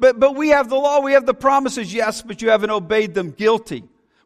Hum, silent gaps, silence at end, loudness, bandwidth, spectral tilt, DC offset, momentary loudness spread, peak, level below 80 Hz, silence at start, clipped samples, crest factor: none; none; 0.45 s; -17 LUFS; 13.5 kHz; -4.5 dB/octave; under 0.1%; 8 LU; -2 dBFS; -52 dBFS; 0 s; under 0.1%; 16 dB